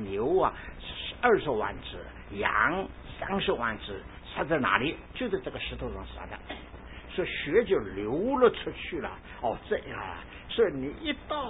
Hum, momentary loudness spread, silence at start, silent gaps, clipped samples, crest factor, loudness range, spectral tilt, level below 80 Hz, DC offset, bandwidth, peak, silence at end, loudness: none; 16 LU; 0 s; none; under 0.1%; 22 dB; 3 LU; -9.5 dB/octave; -48 dBFS; under 0.1%; 4 kHz; -8 dBFS; 0 s; -30 LUFS